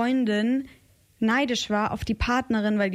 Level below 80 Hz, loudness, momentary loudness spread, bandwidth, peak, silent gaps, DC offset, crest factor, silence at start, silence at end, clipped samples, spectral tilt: -42 dBFS; -25 LUFS; 5 LU; 14 kHz; -12 dBFS; none; under 0.1%; 12 dB; 0 s; 0 s; under 0.1%; -5 dB/octave